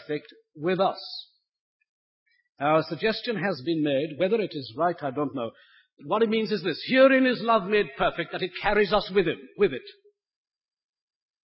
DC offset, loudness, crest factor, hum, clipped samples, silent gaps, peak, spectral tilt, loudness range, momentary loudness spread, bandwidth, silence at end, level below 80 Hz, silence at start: under 0.1%; -25 LUFS; 18 dB; none; under 0.1%; 1.60-1.80 s, 1.89-2.26 s, 5.93-5.97 s; -8 dBFS; -9.5 dB/octave; 6 LU; 11 LU; 5.8 kHz; 1.5 s; -56 dBFS; 0 s